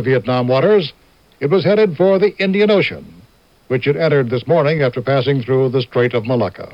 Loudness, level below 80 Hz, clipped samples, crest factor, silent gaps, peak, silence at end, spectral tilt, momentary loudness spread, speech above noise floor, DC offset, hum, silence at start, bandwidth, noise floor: -15 LUFS; -54 dBFS; under 0.1%; 12 dB; none; -2 dBFS; 0.05 s; -8.5 dB/octave; 6 LU; 35 dB; under 0.1%; none; 0 s; 5.8 kHz; -50 dBFS